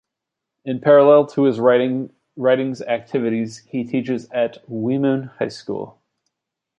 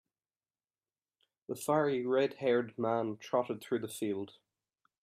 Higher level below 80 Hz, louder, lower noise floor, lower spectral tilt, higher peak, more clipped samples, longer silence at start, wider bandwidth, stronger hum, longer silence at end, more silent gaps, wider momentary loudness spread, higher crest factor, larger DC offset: first, -68 dBFS vs -82 dBFS; first, -19 LUFS vs -34 LUFS; second, -83 dBFS vs under -90 dBFS; first, -7 dB/octave vs -5.5 dB/octave; first, -2 dBFS vs -18 dBFS; neither; second, 0.65 s vs 1.5 s; second, 8.6 kHz vs 15.5 kHz; neither; first, 0.9 s vs 0.75 s; neither; first, 15 LU vs 9 LU; about the same, 18 dB vs 18 dB; neither